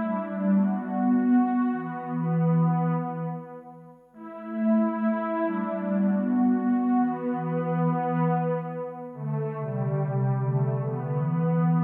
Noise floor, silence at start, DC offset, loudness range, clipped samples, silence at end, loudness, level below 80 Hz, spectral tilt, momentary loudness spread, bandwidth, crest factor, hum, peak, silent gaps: -48 dBFS; 0 s; under 0.1%; 3 LU; under 0.1%; 0 s; -26 LUFS; -76 dBFS; -12.5 dB/octave; 11 LU; 3.5 kHz; 12 dB; none; -14 dBFS; none